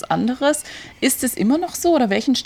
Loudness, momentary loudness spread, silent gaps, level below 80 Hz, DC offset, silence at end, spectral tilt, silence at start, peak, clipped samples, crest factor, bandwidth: -19 LUFS; 5 LU; none; -54 dBFS; under 0.1%; 0.05 s; -3.5 dB/octave; 0.05 s; -4 dBFS; under 0.1%; 14 dB; 19 kHz